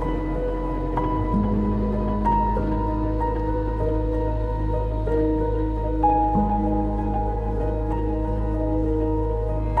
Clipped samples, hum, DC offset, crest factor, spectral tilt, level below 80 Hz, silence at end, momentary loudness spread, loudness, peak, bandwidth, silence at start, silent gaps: under 0.1%; none; under 0.1%; 14 dB; -10.5 dB/octave; -26 dBFS; 0 s; 5 LU; -24 LUFS; -8 dBFS; 4.4 kHz; 0 s; none